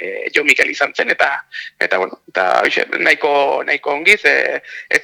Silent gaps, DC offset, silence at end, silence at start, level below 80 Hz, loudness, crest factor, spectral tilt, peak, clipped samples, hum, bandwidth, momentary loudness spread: none; under 0.1%; 0 s; 0 s; -62 dBFS; -14 LUFS; 16 dB; -1.5 dB/octave; 0 dBFS; under 0.1%; none; over 20 kHz; 9 LU